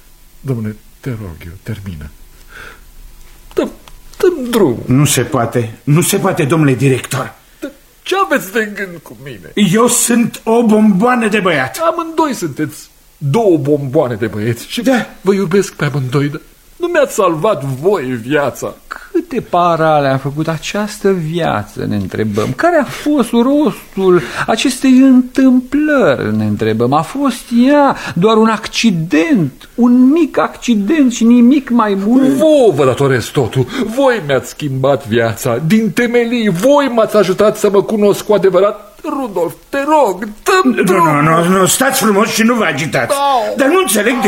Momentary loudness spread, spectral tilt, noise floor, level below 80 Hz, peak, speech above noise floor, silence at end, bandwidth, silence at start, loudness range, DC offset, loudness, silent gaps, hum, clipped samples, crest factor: 11 LU; -5 dB/octave; -36 dBFS; -44 dBFS; 0 dBFS; 23 dB; 0 s; 16.5 kHz; 0.45 s; 5 LU; under 0.1%; -12 LUFS; none; none; under 0.1%; 12 dB